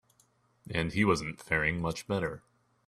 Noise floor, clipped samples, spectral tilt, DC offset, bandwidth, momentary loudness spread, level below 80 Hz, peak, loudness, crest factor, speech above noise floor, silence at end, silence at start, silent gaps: -69 dBFS; under 0.1%; -5.5 dB/octave; under 0.1%; 13.5 kHz; 9 LU; -54 dBFS; -12 dBFS; -31 LUFS; 20 dB; 38 dB; 0.5 s; 0.65 s; none